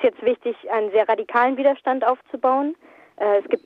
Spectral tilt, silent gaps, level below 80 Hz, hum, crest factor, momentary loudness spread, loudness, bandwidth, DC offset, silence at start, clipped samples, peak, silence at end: -6.5 dB/octave; none; -72 dBFS; none; 16 dB; 7 LU; -21 LUFS; 5 kHz; under 0.1%; 0 s; under 0.1%; -6 dBFS; 0.1 s